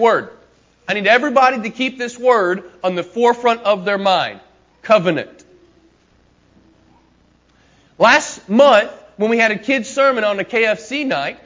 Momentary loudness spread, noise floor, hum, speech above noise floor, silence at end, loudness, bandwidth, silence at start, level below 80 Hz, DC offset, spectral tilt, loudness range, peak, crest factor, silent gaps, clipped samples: 10 LU; -55 dBFS; none; 39 dB; 0.1 s; -16 LUFS; 7.6 kHz; 0 s; -60 dBFS; under 0.1%; -4 dB/octave; 8 LU; 0 dBFS; 16 dB; none; under 0.1%